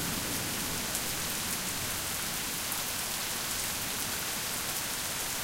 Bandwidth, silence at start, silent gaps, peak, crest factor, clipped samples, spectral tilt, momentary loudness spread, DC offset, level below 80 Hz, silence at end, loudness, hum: 17 kHz; 0 s; none; -10 dBFS; 24 dB; under 0.1%; -1 dB/octave; 1 LU; under 0.1%; -52 dBFS; 0 s; -31 LUFS; none